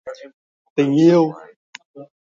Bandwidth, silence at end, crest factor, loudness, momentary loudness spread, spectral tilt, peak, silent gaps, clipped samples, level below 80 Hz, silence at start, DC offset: 7.6 kHz; 0.25 s; 18 dB; -16 LUFS; 26 LU; -7.5 dB/octave; -2 dBFS; 0.34-0.76 s, 1.56-1.73 s, 1.85-1.94 s; under 0.1%; -68 dBFS; 0.05 s; under 0.1%